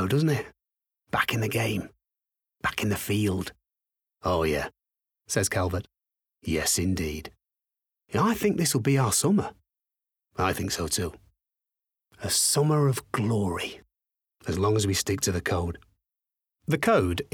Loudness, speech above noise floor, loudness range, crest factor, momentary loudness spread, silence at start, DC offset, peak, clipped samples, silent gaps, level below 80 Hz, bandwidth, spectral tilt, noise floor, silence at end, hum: -26 LUFS; 61 dB; 4 LU; 20 dB; 14 LU; 0 s; under 0.1%; -8 dBFS; under 0.1%; none; -52 dBFS; over 20 kHz; -4.5 dB/octave; -87 dBFS; 0.1 s; none